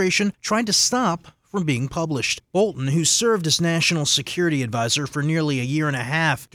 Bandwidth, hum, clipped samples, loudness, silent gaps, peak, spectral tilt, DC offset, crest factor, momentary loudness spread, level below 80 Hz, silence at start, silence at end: 18 kHz; none; under 0.1%; -21 LUFS; none; -6 dBFS; -3.5 dB/octave; under 0.1%; 16 dB; 6 LU; -56 dBFS; 0 s; 0.1 s